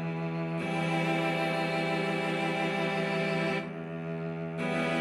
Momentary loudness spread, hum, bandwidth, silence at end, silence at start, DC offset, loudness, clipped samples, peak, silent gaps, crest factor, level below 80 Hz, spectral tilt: 7 LU; none; 12.5 kHz; 0 s; 0 s; under 0.1%; -31 LUFS; under 0.1%; -18 dBFS; none; 14 dB; -70 dBFS; -6 dB/octave